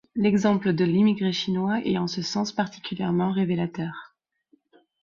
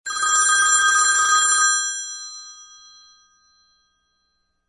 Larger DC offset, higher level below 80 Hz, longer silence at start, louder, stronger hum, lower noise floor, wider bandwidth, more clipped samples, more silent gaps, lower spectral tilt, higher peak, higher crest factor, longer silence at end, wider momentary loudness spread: neither; about the same, -62 dBFS vs -62 dBFS; about the same, 0.15 s vs 0.05 s; second, -25 LUFS vs -16 LUFS; neither; second, -65 dBFS vs -70 dBFS; second, 7.4 kHz vs 11.5 kHz; neither; neither; first, -6.5 dB/octave vs 4.5 dB/octave; about the same, -8 dBFS vs -6 dBFS; about the same, 16 dB vs 16 dB; second, 0.95 s vs 2.05 s; second, 9 LU vs 17 LU